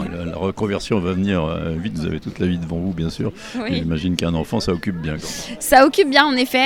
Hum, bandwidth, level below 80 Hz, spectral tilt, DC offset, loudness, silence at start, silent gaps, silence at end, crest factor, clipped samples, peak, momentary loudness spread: none; 17.5 kHz; -40 dBFS; -5 dB/octave; under 0.1%; -20 LUFS; 0 s; none; 0 s; 20 dB; under 0.1%; 0 dBFS; 13 LU